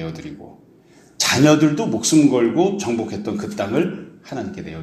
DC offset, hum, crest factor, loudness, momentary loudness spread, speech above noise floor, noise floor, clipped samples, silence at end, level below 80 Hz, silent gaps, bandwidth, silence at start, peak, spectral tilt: under 0.1%; none; 18 dB; -18 LUFS; 17 LU; 31 dB; -50 dBFS; under 0.1%; 0 s; -54 dBFS; none; 14 kHz; 0 s; 0 dBFS; -4.5 dB/octave